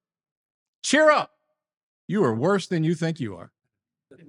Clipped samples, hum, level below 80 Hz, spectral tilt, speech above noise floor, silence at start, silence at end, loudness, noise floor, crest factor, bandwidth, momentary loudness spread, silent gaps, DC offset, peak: under 0.1%; none; -76 dBFS; -5 dB/octave; 42 dB; 0.85 s; 0.85 s; -23 LUFS; -64 dBFS; 20 dB; 11.5 kHz; 16 LU; 1.77-2.08 s; under 0.1%; -4 dBFS